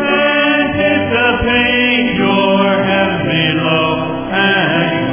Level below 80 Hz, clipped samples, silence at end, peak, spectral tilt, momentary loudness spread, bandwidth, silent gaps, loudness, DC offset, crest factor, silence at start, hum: -38 dBFS; under 0.1%; 0 s; 0 dBFS; -9 dB/octave; 3 LU; 3.6 kHz; none; -12 LUFS; under 0.1%; 12 dB; 0 s; none